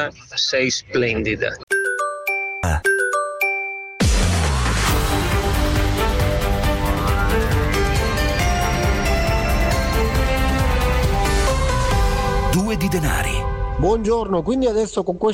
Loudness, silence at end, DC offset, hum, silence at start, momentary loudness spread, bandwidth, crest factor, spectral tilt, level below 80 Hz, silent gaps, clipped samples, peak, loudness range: -20 LUFS; 0 s; under 0.1%; none; 0 s; 3 LU; 16.5 kHz; 12 dB; -5 dB/octave; -24 dBFS; 1.63-1.67 s; under 0.1%; -8 dBFS; 1 LU